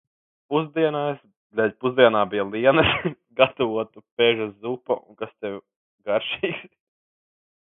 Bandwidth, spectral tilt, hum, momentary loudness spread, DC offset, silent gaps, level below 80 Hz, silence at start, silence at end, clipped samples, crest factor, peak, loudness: 4 kHz; -10 dB/octave; none; 16 LU; under 0.1%; 1.37-1.50 s, 4.11-4.17 s, 5.76-5.98 s; -54 dBFS; 0.5 s; 1.15 s; under 0.1%; 24 dB; 0 dBFS; -23 LUFS